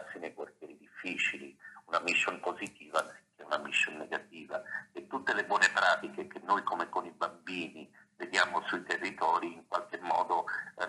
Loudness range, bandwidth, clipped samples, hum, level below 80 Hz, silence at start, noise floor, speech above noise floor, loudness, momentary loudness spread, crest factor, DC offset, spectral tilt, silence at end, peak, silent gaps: 3 LU; 12 kHz; under 0.1%; none; -86 dBFS; 0 s; -53 dBFS; 19 dB; -33 LUFS; 15 LU; 26 dB; under 0.1%; -2 dB/octave; 0 s; -10 dBFS; none